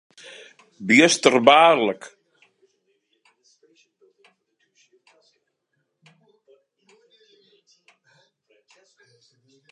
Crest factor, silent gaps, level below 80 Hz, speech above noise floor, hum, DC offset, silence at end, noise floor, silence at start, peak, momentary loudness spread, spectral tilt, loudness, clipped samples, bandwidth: 24 dB; none; -78 dBFS; 59 dB; none; under 0.1%; 7.65 s; -75 dBFS; 0.8 s; 0 dBFS; 29 LU; -3 dB/octave; -16 LUFS; under 0.1%; 11.5 kHz